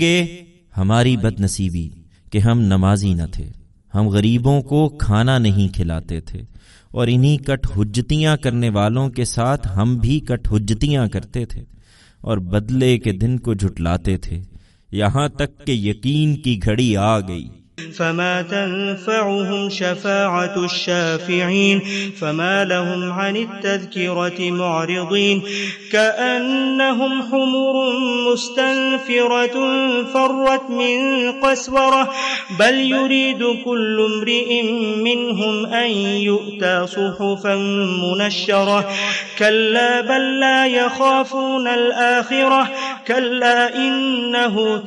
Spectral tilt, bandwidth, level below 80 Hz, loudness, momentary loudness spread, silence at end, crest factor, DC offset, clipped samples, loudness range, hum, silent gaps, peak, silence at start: -5.5 dB/octave; 11.5 kHz; -36 dBFS; -18 LUFS; 8 LU; 0 s; 16 dB; under 0.1%; under 0.1%; 4 LU; none; none; -2 dBFS; 0 s